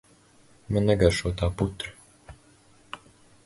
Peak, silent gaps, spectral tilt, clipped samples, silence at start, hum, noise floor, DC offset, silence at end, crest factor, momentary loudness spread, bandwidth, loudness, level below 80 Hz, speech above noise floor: -4 dBFS; none; -6 dB/octave; under 0.1%; 0.7 s; none; -57 dBFS; under 0.1%; 0.5 s; 24 dB; 22 LU; 11.5 kHz; -26 LUFS; -40 dBFS; 33 dB